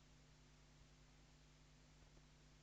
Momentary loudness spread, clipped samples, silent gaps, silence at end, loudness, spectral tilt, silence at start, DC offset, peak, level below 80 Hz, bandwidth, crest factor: 1 LU; under 0.1%; none; 0 s; -69 LUFS; -4 dB/octave; 0 s; under 0.1%; -54 dBFS; -72 dBFS; 8.2 kHz; 14 dB